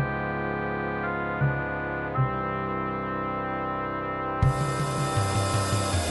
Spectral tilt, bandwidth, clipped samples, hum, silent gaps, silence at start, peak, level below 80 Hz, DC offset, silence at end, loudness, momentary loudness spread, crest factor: -5.5 dB/octave; 11.5 kHz; under 0.1%; none; none; 0 s; -10 dBFS; -42 dBFS; under 0.1%; 0 s; -28 LUFS; 4 LU; 18 dB